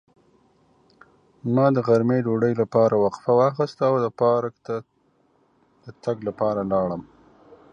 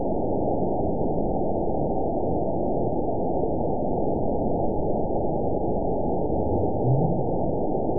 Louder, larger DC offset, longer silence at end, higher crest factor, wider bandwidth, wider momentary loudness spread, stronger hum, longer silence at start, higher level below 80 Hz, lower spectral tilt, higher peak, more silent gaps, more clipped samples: first, -22 LUFS vs -26 LUFS; second, under 0.1% vs 4%; first, 0.7 s vs 0 s; about the same, 18 dB vs 14 dB; first, 7.6 kHz vs 1 kHz; first, 13 LU vs 2 LU; neither; first, 1.45 s vs 0 s; second, -60 dBFS vs -38 dBFS; second, -9 dB/octave vs -18.5 dB/octave; first, -4 dBFS vs -10 dBFS; neither; neither